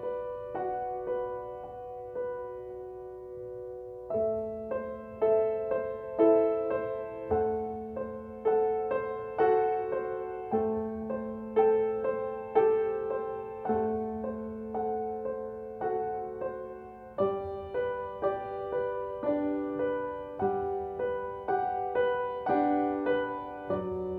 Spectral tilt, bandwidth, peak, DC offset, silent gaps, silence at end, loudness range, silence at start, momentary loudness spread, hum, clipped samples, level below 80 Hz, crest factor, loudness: -9 dB/octave; 4 kHz; -12 dBFS; under 0.1%; none; 0 s; 7 LU; 0 s; 13 LU; none; under 0.1%; -60 dBFS; 20 dB; -31 LUFS